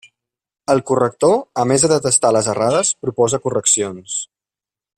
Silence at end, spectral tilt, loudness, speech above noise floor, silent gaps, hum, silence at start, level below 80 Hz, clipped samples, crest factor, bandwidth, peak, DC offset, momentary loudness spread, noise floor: 0.75 s; -3.5 dB/octave; -16 LUFS; 73 dB; none; none; 0.7 s; -56 dBFS; under 0.1%; 18 dB; 14.5 kHz; 0 dBFS; under 0.1%; 11 LU; -90 dBFS